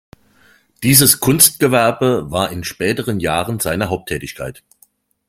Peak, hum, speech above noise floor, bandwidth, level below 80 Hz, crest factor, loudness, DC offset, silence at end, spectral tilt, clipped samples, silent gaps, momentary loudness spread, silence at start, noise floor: 0 dBFS; none; 40 dB; 17 kHz; -46 dBFS; 18 dB; -14 LUFS; under 0.1%; 0.75 s; -3.5 dB/octave; under 0.1%; none; 15 LU; 0.8 s; -55 dBFS